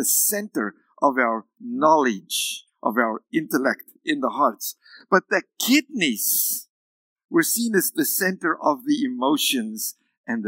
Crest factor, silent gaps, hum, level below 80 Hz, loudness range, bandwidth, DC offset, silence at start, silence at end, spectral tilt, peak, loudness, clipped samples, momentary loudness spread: 22 dB; 6.69-7.16 s, 7.25-7.29 s, 10.17-10.24 s; none; under -90 dBFS; 2 LU; 16.5 kHz; under 0.1%; 0 s; 0 s; -2.5 dB/octave; -2 dBFS; -22 LUFS; under 0.1%; 10 LU